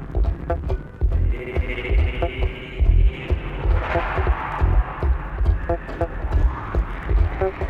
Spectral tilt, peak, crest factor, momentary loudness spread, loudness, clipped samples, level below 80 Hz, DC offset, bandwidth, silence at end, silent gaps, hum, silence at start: -8.5 dB/octave; -6 dBFS; 16 dB; 5 LU; -24 LUFS; under 0.1%; -22 dBFS; under 0.1%; 4.7 kHz; 0 s; none; none; 0 s